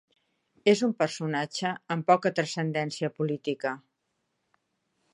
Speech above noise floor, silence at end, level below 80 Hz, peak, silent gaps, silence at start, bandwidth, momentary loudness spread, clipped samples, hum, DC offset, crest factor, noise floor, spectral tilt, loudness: 51 dB; 1.35 s; -78 dBFS; -6 dBFS; none; 0.65 s; 11.5 kHz; 8 LU; under 0.1%; none; under 0.1%; 22 dB; -79 dBFS; -5.5 dB/octave; -28 LUFS